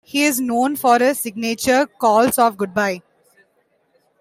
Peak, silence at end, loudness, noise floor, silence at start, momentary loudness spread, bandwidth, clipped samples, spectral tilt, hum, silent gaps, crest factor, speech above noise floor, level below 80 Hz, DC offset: -2 dBFS; 1.2 s; -17 LUFS; -63 dBFS; 0.15 s; 8 LU; 16 kHz; under 0.1%; -3 dB/octave; none; none; 16 dB; 46 dB; -60 dBFS; under 0.1%